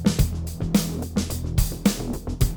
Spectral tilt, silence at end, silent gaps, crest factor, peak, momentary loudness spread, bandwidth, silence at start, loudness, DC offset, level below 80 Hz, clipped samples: -5.5 dB/octave; 0 s; none; 18 dB; -6 dBFS; 7 LU; over 20 kHz; 0 s; -25 LUFS; under 0.1%; -30 dBFS; under 0.1%